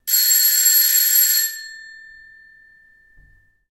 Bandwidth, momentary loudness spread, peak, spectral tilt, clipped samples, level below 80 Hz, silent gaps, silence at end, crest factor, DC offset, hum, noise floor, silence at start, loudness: 16 kHz; 15 LU; -4 dBFS; 6.5 dB/octave; under 0.1%; -62 dBFS; none; 1.8 s; 16 dB; under 0.1%; none; -53 dBFS; 0.05 s; -13 LUFS